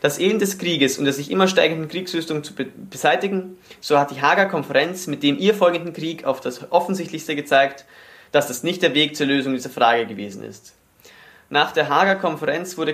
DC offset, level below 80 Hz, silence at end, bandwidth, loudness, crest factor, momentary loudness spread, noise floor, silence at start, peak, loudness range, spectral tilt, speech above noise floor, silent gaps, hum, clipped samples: under 0.1%; -68 dBFS; 0 s; 15.5 kHz; -20 LUFS; 20 dB; 10 LU; -49 dBFS; 0 s; -2 dBFS; 2 LU; -4 dB/octave; 28 dB; none; none; under 0.1%